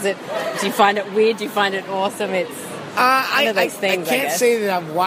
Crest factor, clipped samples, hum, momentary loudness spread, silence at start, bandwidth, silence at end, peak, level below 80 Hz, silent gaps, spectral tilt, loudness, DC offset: 20 dB; under 0.1%; none; 8 LU; 0 s; 15.5 kHz; 0 s; 0 dBFS; -70 dBFS; none; -3 dB/octave; -19 LUFS; under 0.1%